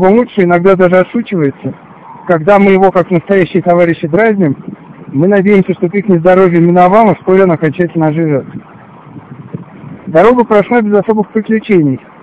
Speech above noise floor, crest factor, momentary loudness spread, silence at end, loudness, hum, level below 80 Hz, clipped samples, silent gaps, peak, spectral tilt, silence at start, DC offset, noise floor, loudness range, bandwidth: 24 dB; 10 dB; 17 LU; 0.25 s; -9 LUFS; none; -44 dBFS; 0.4%; none; 0 dBFS; -9.5 dB/octave; 0 s; under 0.1%; -33 dBFS; 4 LU; 5.2 kHz